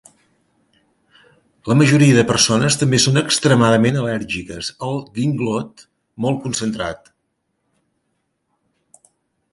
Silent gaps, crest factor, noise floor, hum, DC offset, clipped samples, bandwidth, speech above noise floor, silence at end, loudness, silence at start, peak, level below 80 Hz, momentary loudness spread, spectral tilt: none; 18 dB; -71 dBFS; none; under 0.1%; under 0.1%; 11.5 kHz; 55 dB; 2.55 s; -17 LUFS; 1.65 s; 0 dBFS; -50 dBFS; 13 LU; -4.5 dB/octave